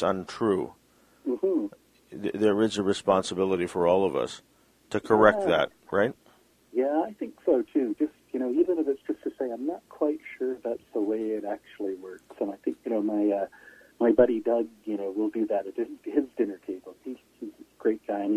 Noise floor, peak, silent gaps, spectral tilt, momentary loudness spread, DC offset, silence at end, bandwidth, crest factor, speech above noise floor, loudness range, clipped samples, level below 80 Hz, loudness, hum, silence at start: -61 dBFS; -4 dBFS; none; -6 dB/octave; 14 LU; under 0.1%; 0 s; 14 kHz; 24 dB; 34 dB; 6 LU; under 0.1%; -64 dBFS; -28 LUFS; none; 0 s